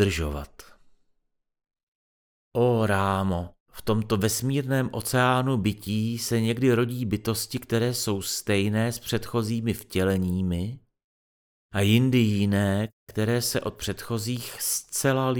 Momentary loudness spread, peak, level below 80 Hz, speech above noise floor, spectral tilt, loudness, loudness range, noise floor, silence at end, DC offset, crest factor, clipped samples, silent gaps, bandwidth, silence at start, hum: 9 LU; -6 dBFS; -48 dBFS; 50 dB; -5 dB/octave; -26 LUFS; 4 LU; -75 dBFS; 0 s; under 0.1%; 20 dB; under 0.1%; 1.83-2.51 s, 3.60-3.66 s, 11.04-11.69 s, 12.93-13.07 s; over 20 kHz; 0 s; none